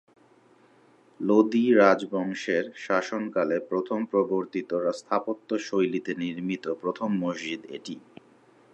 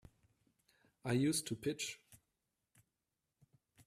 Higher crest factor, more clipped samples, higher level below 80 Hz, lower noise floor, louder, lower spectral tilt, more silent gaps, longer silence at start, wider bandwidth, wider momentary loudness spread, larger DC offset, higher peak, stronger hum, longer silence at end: about the same, 20 dB vs 20 dB; neither; about the same, -78 dBFS vs -74 dBFS; second, -59 dBFS vs -89 dBFS; first, -26 LUFS vs -39 LUFS; first, -6 dB/octave vs -4.5 dB/octave; neither; first, 1.2 s vs 1.05 s; second, 9 kHz vs 15.5 kHz; about the same, 12 LU vs 13 LU; neither; first, -6 dBFS vs -24 dBFS; neither; first, 0.75 s vs 0.05 s